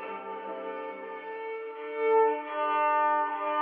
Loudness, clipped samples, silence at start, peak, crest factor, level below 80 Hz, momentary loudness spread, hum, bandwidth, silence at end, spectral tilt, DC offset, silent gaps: -29 LUFS; under 0.1%; 0 s; -14 dBFS; 14 dB; under -90 dBFS; 13 LU; 50 Hz at -85 dBFS; 4.3 kHz; 0 s; -0.5 dB/octave; under 0.1%; none